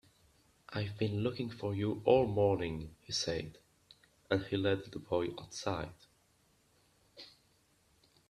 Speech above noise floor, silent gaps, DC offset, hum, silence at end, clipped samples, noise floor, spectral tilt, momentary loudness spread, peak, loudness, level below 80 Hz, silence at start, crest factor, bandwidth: 37 dB; none; under 0.1%; none; 1 s; under 0.1%; -71 dBFS; -5.5 dB/octave; 18 LU; -14 dBFS; -35 LUFS; -62 dBFS; 0.7 s; 24 dB; 13 kHz